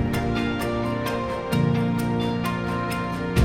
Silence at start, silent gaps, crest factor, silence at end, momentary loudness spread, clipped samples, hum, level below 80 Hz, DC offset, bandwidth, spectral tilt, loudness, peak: 0 s; none; 16 dB; 0 s; 4 LU; under 0.1%; none; -38 dBFS; under 0.1%; 16.5 kHz; -6.5 dB/octave; -25 LUFS; -8 dBFS